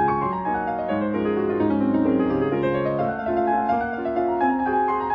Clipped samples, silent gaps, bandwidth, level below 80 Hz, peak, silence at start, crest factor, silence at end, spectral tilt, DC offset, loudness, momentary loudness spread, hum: under 0.1%; none; 5.4 kHz; -50 dBFS; -10 dBFS; 0 s; 12 dB; 0 s; -10 dB/octave; under 0.1%; -23 LUFS; 4 LU; none